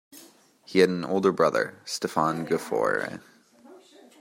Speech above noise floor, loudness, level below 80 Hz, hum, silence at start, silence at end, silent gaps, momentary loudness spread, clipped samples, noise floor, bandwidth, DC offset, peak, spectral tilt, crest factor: 29 dB; -25 LUFS; -70 dBFS; none; 0.15 s; 0.45 s; none; 9 LU; under 0.1%; -54 dBFS; 16 kHz; under 0.1%; -6 dBFS; -5 dB/octave; 22 dB